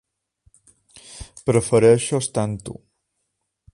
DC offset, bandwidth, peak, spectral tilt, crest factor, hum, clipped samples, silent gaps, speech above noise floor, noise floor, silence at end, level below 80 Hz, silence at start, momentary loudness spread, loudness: under 0.1%; 11.5 kHz; -4 dBFS; -5.5 dB/octave; 20 dB; none; under 0.1%; none; 58 dB; -76 dBFS; 1 s; -50 dBFS; 1.1 s; 24 LU; -19 LUFS